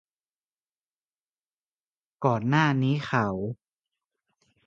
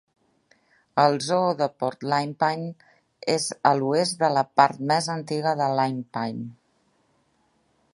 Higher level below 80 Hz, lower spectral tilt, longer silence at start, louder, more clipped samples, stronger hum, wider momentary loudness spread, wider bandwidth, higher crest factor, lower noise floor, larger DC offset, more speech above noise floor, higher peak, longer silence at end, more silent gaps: first, -64 dBFS vs -72 dBFS; first, -7.5 dB/octave vs -4.5 dB/octave; first, 2.2 s vs 0.95 s; about the same, -26 LUFS vs -24 LUFS; neither; neither; about the same, 12 LU vs 10 LU; second, 7.4 kHz vs 11.5 kHz; about the same, 22 dB vs 24 dB; first, under -90 dBFS vs -67 dBFS; neither; first, over 65 dB vs 44 dB; second, -8 dBFS vs -2 dBFS; second, 1.15 s vs 1.4 s; neither